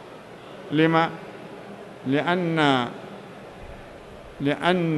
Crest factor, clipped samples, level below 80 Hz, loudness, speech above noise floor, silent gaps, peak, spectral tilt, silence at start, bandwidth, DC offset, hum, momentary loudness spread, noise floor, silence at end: 18 dB; under 0.1%; -56 dBFS; -23 LUFS; 20 dB; none; -6 dBFS; -6.5 dB/octave; 0 s; 12 kHz; under 0.1%; none; 22 LU; -42 dBFS; 0 s